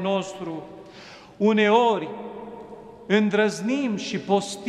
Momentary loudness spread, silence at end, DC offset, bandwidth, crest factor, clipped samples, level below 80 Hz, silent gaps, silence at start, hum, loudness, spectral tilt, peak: 24 LU; 0 s; under 0.1%; 12 kHz; 18 dB; under 0.1%; -66 dBFS; none; 0 s; none; -23 LUFS; -5 dB/octave; -6 dBFS